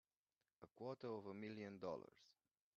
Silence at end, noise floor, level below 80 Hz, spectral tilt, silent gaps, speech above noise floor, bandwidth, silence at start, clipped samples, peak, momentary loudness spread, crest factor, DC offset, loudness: 0.45 s; under -90 dBFS; under -90 dBFS; -5.5 dB/octave; none; over 38 dB; 7 kHz; 0.6 s; under 0.1%; -36 dBFS; 16 LU; 20 dB; under 0.1%; -53 LUFS